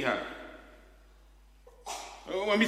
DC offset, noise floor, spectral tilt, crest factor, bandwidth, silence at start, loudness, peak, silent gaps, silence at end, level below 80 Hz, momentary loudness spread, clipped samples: under 0.1%; -58 dBFS; -3.5 dB/octave; 22 dB; 15 kHz; 0 s; -36 LUFS; -12 dBFS; none; 0 s; -58 dBFS; 23 LU; under 0.1%